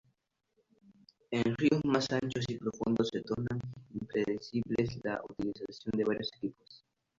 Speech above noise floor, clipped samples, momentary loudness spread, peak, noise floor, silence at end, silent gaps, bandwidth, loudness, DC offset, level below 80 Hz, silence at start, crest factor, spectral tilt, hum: 45 dB; under 0.1%; 10 LU; -12 dBFS; -79 dBFS; 0.4 s; none; 7.8 kHz; -34 LUFS; under 0.1%; -64 dBFS; 1.3 s; 22 dB; -6.5 dB/octave; none